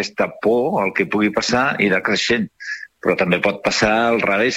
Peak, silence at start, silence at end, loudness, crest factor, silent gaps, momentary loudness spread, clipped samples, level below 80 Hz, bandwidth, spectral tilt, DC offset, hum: -2 dBFS; 0 s; 0 s; -18 LUFS; 18 dB; none; 6 LU; under 0.1%; -50 dBFS; 16 kHz; -4 dB/octave; under 0.1%; none